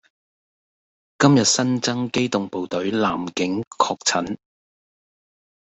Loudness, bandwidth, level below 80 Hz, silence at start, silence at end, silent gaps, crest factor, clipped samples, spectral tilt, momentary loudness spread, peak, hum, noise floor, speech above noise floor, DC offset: -21 LUFS; 8.2 kHz; -62 dBFS; 1.2 s; 1.45 s; 3.67-3.71 s; 20 dB; under 0.1%; -4 dB/octave; 9 LU; -2 dBFS; none; under -90 dBFS; over 69 dB; under 0.1%